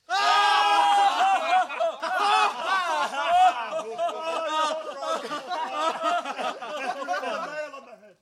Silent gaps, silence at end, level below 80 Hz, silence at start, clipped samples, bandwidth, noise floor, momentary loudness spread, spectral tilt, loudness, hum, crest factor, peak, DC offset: none; 0.15 s; -74 dBFS; 0.1 s; under 0.1%; 13.5 kHz; -45 dBFS; 12 LU; -0.5 dB/octave; -24 LUFS; none; 16 dB; -10 dBFS; under 0.1%